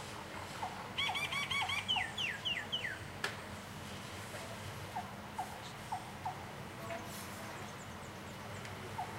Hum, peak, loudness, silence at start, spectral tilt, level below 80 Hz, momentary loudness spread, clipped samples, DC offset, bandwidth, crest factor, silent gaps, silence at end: none; -20 dBFS; -40 LUFS; 0 s; -3 dB/octave; -64 dBFS; 12 LU; under 0.1%; under 0.1%; 16 kHz; 22 dB; none; 0 s